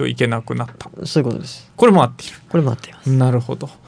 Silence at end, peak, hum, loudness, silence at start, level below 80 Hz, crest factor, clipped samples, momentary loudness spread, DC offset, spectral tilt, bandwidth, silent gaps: 0.15 s; 0 dBFS; none; -18 LUFS; 0 s; -56 dBFS; 18 dB; under 0.1%; 16 LU; under 0.1%; -7 dB/octave; 10.5 kHz; none